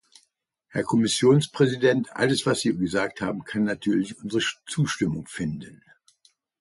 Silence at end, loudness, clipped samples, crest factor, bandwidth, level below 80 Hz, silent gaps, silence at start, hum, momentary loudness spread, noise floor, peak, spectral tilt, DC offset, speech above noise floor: 0.85 s; -24 LUFS; under 0.1%; 18 dB; 11.5 kHz; -58 dBFS; none; 0.75 s; none; 11 LU; -72 dBFS; -6 dBFS; -5 dB/octave; under 0.1%; 48 dB